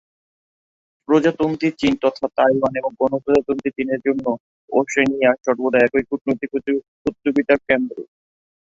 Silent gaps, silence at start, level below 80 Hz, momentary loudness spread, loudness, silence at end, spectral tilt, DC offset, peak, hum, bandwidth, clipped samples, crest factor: 4.40-4.68 s, 6.21-6.25 s, 6.88-7.05 s; 1.1 s; -54 dBFS; 7 LU; -19 LUFS; 0.7 s; -6 dB/octave; under 0.1%; -2 dBFS; none; 7.8 kHz; under 0.1%; 18 dB